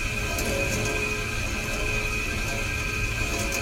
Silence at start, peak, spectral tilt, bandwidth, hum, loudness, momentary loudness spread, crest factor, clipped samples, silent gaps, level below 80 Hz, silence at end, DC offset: 0 s; -12 dBFS; -3.5 dB/octave; 16 kHz; none; -26 LUFS; 2 LU; 14 dB; under 0.1%; none; -34 dBFS; 0 s; under 0.1%